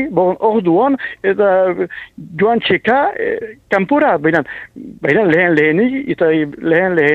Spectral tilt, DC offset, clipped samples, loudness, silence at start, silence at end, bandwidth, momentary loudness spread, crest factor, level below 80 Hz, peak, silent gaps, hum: -8 dB/octave; under 0.1%; under 0.1%; -14 LUFS; 0 s; 0 s; 7.8 kHz; 10 LU; 14 dB; -52 dBFS; 0 dBFS; none; none